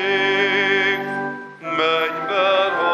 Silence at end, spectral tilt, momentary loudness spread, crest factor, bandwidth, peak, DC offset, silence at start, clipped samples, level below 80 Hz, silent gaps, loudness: 0 s; -4 dB/octave; 9 LU; 14 dB; 13 kHz; -6 dBFS; under 0.1%; 0 s; under 0.1%; -78 dBFS; none; -19 LUFS